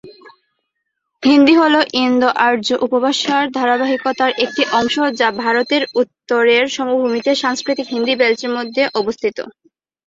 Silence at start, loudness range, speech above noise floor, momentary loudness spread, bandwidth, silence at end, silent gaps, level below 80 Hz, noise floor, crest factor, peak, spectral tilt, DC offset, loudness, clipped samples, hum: 0.05 s; 2 LU; 59 dB; 8 LU; 7.8 kHz; 0.55 s; none; -60 dBFS; -74 dBFS; 16 dB; 0 dBFS; -3 dB/octave; under 0.1%; -15 LUFS; under 0.1%; none